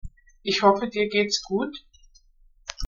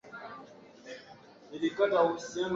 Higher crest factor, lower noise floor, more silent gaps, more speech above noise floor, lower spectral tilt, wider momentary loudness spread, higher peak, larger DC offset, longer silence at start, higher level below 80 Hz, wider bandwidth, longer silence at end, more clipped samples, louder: about the same, 22 dB vs 18 dB; about the same, -57 dBFS vs -54 dBFS; neither; first, 34 dB vs 25 dB; second, -2.5 dB/octave vs -4.5 dB/octave; second, 19 LU vs 23 LU; first, -4 dBFS vs -14 dBFS; neither; about the same, 0.05 s vs 0.05 s; first, -50 dBFS vs -74 dBFS; about the same, 7.6 kHz vs 7.8 kHz; about the same, 0 s vs 0 s; neither; first, -23 LUFS vs -30 LUFS